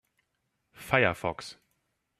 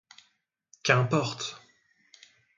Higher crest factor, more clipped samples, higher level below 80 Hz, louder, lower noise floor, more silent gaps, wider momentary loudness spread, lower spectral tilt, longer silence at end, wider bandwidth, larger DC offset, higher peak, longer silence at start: about the same, 26 dB vs 26 dB; neither; first, -62 dBFS vs -72 dBFS; about the same, -27 LUFS vs -27 LUFS; first, -79 dBFS vs -73 dBFS; neither; first, 20 LU vs 14 LU; about the same, -5 dB/octave vs -4.5 dB/octave; second, 0.7 s vs 1 s; first, 14.5 kHz vs 7.6 kHz; neither; about the same, -8 dBFS vs -6 dBFS; about the same, 0.8 s vs 0.85 s